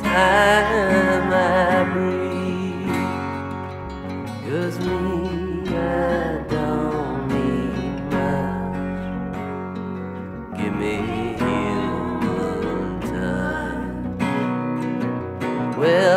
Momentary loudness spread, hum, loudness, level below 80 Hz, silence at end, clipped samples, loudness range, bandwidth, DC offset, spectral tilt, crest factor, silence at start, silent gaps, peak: 12 LU; none; -22 LUFS; -40 dBFS; 0 s; under 0.1%; 5 LU; 15.5 kHz; under 0.1%; -6.5 dB/octave; 18 dB; 0 s; none; -4 dBFS